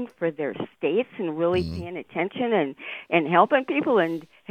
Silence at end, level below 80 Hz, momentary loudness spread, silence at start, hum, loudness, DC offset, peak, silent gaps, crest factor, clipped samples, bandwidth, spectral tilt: 0.25 s; -58 dBFS; 12 LU; 0 s; none; -24 LUFS; under 0.1%; -4 dBFS; none; 22 dB; under 0.1%; 9 kHz; -7.5 dB/octave